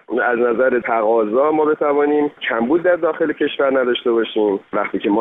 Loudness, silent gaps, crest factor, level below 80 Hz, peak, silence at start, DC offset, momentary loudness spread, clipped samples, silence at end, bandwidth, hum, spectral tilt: -17 LUFS; none; 12 dB; -62 dBFS; -4 dBFS; 0.1 s; under 0.1%; 4 LU; under 0.1%; 0 s; 3.9 kHz; none; -8.5 dB/octave